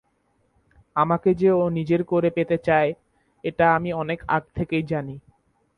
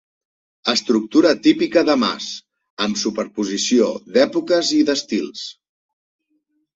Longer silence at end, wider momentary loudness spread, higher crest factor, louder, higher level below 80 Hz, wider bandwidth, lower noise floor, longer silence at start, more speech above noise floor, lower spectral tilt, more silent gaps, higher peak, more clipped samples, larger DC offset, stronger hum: second, 0.6 s vs 1.25 s; about the same, 11 LU vs 12 LU; about the same, 18 dB vs 18 dB; second, -23 LUFS vs -18 LUFS; first, -52 dBFS vs -62 dBFS; second, 6 kHz vs 8 kHz; about the same, -67 dBFS vs -68 dBFS; first, 0.95 s vs 0.65 s; second, 46 dB vs 50 dB; first, -9 dB/octave vs -3.5 dB/octave; second, none vs 2.70-2.77 s; second, -6 dBFS vs -2 dBFS; neither; neither; neither